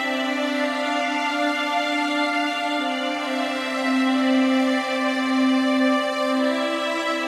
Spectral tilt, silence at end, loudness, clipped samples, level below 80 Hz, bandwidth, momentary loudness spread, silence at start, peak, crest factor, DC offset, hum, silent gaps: -2.5 dB/octave; 0 s; -22 LUFS; under 0.1%; -76 dBFS; 14 kHz; 4 LU; 0 s; -10 dBFS; 12 dB; under 0.1%; none; none